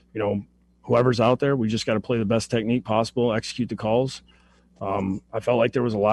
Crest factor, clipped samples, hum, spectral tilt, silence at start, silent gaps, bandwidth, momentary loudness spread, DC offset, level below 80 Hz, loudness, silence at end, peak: 16 dB; under 0.1%; none; -6.5 dB/octave; 0.15 s; none; 12 kHz; 8 LU; under 0.1%; -54 dBFS; -24 LUFS; 0 s; -8 dBFS